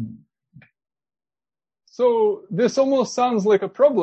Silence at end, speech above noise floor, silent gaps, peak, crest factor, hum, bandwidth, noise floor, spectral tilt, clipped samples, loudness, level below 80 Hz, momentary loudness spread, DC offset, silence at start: 0 s; over 72 dB; none; -4 dBFS; 16 dB; none; 8.4 kHz; under -90 dBFS; -5.5 dB/octave; under 0.1%; -20 LUFS; -70 dBFS; 4 LU; under 0.1%; 0 s